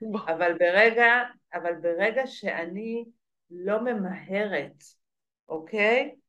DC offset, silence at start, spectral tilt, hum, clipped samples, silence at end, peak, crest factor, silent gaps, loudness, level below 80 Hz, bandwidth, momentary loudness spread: under 0.1%; 0 s; -5.5 dB/octave; none; under 0.1%; 0.15 s; -6 dBFS; 20 dB; 5.39-5.47 s; -25 LUFS; -84 dBFS; 9.8 kHz; 15 LU